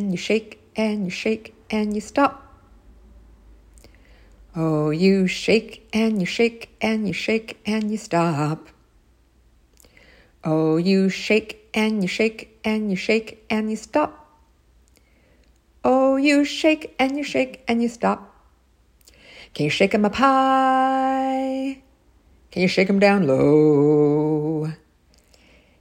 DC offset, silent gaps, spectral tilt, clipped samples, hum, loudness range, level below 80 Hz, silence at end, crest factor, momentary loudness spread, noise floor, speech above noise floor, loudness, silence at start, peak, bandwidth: under 0.1%; none; -6 dB/octave; under 0.1%; none; 7 LU; -54 dBFS; 1.05 s; 20 dB; 10 LU; -58 dBFS; 38 dB; -21 LUFS; 0 s; -2 dBFS; 16 kHz